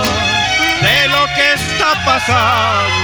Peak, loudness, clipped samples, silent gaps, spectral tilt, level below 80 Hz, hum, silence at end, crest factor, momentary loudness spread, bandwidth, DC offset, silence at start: 0 dBFS; -11 LUFS; under 0.1%; none; -3 dB/octave; -36 dBFS; none; 0 s; 12 dB; 3 LU; over 20 kHz; under 0.1%; 0 s